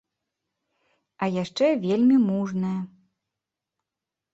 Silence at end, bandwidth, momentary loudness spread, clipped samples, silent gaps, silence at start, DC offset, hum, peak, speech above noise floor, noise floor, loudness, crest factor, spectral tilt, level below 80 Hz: 1.45 s; 8 kHz; 11 LU; under 0.1%; none; 1.2 s; under 0.1%; none; -10 dBFS; 65 dB; -87 dBFS; -24 LUFS; 16 dB; -7.5 dB/octave; -70 dBFS